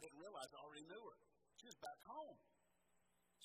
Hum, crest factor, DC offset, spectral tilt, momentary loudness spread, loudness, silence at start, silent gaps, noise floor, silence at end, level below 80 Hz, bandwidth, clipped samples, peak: none; 22 dB; under 0.1%; -2.5 dB/octave; 8 LU; -58 LUFS; 0 s; none; -84 dBFS; 0 s; under -90 dBFS; 14 kHz; under 0.1%; -38 dBFS